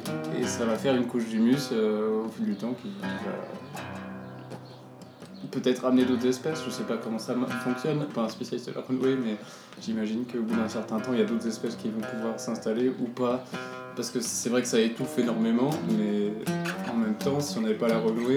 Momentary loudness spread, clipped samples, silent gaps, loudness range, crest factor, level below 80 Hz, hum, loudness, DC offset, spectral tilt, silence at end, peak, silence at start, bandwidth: 13 LU; under 0.1%; none; 4 LU; 16 dB; -78 dBFS; none; -29 LUFS; under 0.1%; -5 dB/octave; 0 s; -12 dBFS; 0 s; 16.5 kHz